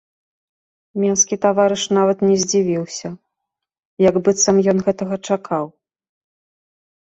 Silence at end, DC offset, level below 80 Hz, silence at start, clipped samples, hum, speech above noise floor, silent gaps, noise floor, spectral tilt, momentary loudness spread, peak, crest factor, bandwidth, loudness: 1.35 s; under 0.1%; -58 dBFS; 0.95 s; under 0.1%; none; 64 dB; 3.85-3.97 s; -81 dBFS; -4.5 dB/octave; 12 LU; -2 dBFS; 18 dB; 8.2 kHz; -17 LUFS